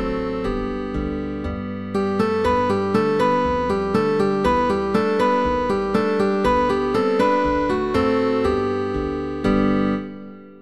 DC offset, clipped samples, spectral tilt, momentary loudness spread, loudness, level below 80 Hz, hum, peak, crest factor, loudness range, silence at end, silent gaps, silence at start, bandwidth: 0.5%; under 0.1%; -7 dB/octave; 7 LU; -20 LUFS; -38 dBFS; none; -6 dBFS; 14 dB; 2 LU; 0 s; none; 0 s; 12.5 kHz